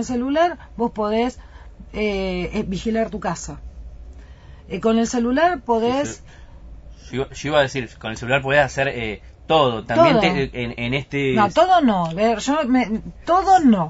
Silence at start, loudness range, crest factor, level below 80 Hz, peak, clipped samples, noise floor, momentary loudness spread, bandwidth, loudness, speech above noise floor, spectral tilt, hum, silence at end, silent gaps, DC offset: 0 s; 7 LU; 18 dB; -40 dBFS; -2 dBFS; under 0.1%; -41 dBFS; 14 LU; 8 kHz; -20 LUFS; 22 dB; -5.5 dB/octave; none; 0 s; none; under 0.1%